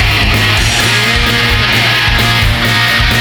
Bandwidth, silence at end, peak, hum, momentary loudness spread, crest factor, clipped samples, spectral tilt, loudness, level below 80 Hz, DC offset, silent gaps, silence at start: over 20 kHz; 0 s; 0 dBFS; none; 1 LU; 10 dB; under 0.1%; -3.5 dB/octave; -9 LUFS; -18 dBFS; under 0.1%; none; 0 s